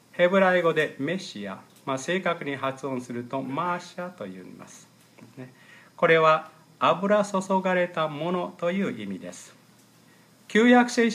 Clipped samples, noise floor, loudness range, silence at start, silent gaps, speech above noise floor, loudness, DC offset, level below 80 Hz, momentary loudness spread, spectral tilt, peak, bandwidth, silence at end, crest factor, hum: under 0.1%; -56 dBFS; 8 LU; 0.15 s; none; 31 dB; -24 LUFS; under 0.1%; -78 dBFS; 20 LU; -5.5 dB/octave; -6 dBFS; 14.5 kHz; 0 s; 20 dB; none